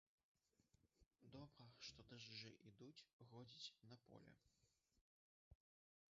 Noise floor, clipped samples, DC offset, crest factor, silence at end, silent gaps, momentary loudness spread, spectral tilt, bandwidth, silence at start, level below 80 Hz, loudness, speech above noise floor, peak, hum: -84 dBFS; under 0.1%; under 0.1%; 24 dB; 0.55 s; 1.07-1.11 s, 3.13-3.19 s, 5.01-5.51 s; 9 LU; -3.5 dB/octave; 7.4 kHz; 0.6 s; -86 dBFS; -62 LUFS; 20 dB; -42 dBFS; none